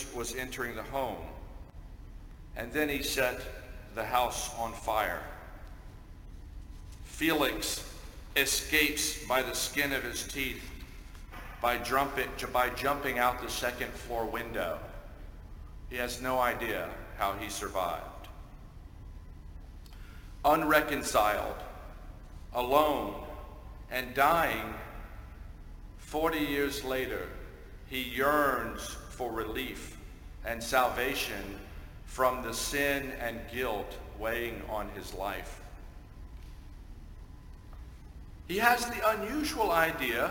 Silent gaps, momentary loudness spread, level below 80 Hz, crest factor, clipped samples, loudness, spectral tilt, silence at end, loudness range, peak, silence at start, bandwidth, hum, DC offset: none; 23 LU; -46 dBFS; 26 dB; under 0.1%; -31 LUFS; -3 dB/octave; 0 s; 7 LU; -8 dBFS; 0 s; 17 kHz; none; under 0.1%